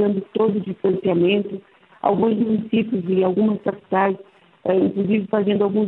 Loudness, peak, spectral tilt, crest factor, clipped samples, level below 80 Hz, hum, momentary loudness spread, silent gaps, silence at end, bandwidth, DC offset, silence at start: -20 LUFS; -4 dBFS; -10.5 dB/octave; 16 dB; under 0.1%; -62 dBFS; none; 6 LU; none; 0 s; 4.1 kHz; under 0.1%; 0 s